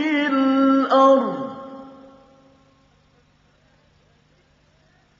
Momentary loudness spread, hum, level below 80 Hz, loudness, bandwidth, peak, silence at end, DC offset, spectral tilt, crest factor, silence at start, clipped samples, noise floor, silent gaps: 23 LU; none; -68 dBFS; -17 LUFS; 7.2 kHz; -4 dBFS; 3.3 s; under 0.1%; -3 dB/octave; 18 dB; 0 s; under 0.1%; -59 dBFS; none